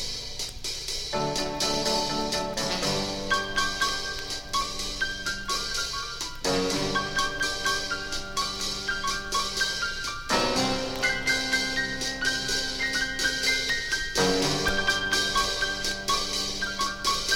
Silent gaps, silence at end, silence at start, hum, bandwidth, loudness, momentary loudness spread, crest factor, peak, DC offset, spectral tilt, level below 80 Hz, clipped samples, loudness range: none; 0 s; 0 s; none; 17 kHz; -26 LUFS; 6 LU; 18 dB; -10 dBFS; under 0.1%; -2 dB/octave; -42 dBFS; under 0.1%; 3 LU